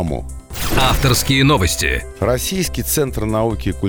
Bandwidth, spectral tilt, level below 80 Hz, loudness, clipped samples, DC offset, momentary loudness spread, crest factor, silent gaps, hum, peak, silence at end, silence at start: over 20 kHz; -4 dB/octave; -26 dBFS; -17 LUFS; under 0.1%; 1%; 9 LU; 14 dB; none; none; -2 dBFS; 0 s; 0 s